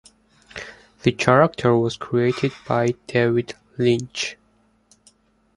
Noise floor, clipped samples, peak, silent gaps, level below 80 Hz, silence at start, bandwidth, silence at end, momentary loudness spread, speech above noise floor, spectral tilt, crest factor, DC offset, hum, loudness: -61 dBFS; under 0.1%; 0 dBFS; none; -54 dBFS; 0.55 s; 11 kHz; 1.25 s; 20 LU; 41 dB; -6 dB/octave; 22 dB; under 0.1%; none; -21 LUFS